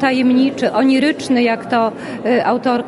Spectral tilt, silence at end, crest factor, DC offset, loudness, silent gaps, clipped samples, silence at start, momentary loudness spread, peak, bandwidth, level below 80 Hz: -5 dB/octave; 0 s; 12 dB; under 0.1%; -15 LUFS; none; under 0.1%; 0 s; 4 LU; -4 dBFS; 11.5 kHz; -58 dBFS